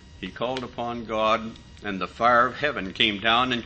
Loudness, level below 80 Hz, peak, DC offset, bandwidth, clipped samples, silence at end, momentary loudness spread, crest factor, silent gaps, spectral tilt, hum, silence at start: -24 LUFS; -50 dBFS; -4 dBFS; under 0.1%; 8.6 kHz; under 0.1%; 0 s; 14 LU; 22 dB; none; -4.5 dB/octave; none; 0 s